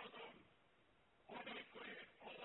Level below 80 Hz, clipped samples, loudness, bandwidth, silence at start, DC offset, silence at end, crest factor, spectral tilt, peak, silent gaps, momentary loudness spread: -88 dBFS; under 0.1%; -55 LUFS; 4 kHz; 0 s; under 0.1%; 0 s; 18 dB; -0.5 dB/octave; -40 dBFS; none; 7 LU